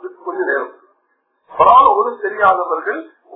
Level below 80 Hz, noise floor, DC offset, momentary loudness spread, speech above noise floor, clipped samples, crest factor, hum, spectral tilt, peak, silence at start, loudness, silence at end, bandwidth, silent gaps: -54 dBFS; -65 dBFS; under 0.1%; 18 LU; 52 dB; under 0.1%; 16 dB; none; -7.5 dB/octave; 0 dBFS; 0.05 s; -14 LUFS; 0 s; 3.9 kHz; none